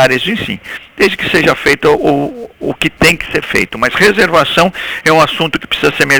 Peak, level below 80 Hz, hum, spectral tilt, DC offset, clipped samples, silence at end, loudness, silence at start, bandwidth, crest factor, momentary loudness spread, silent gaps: 0 dBFS; -38 dBFS; none; -4 dB/octave; under 0.1%; under 0.1%; 0 s; -11 LUFS; 0 s; over 20 kHz; 12 dB; 9 LU; none